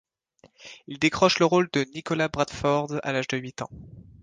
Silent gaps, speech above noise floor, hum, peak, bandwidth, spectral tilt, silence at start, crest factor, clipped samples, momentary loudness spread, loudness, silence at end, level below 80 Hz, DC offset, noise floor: none; 35 dB; none; -4 dBFS; 9.8 kHz; -5 dB/octave; 0.6 s; 22 dB; under 0.1%; 19 LU; -24 LUFS; 0.2 s; -54 dBFS; under 0.1%; -60 dBFS